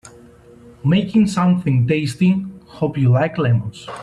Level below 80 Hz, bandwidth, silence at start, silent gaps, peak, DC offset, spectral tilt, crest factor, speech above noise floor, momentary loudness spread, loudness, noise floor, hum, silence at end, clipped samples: -50 dBFS; 11.5 kHz; 0.05 s; none; -4 dBFS; under 0.1%; -7.5 dB/octave; 14 dB; 28 dB; 8 LU; -18 LUFS; -44 dBFS; none; 0 s; under 0.1%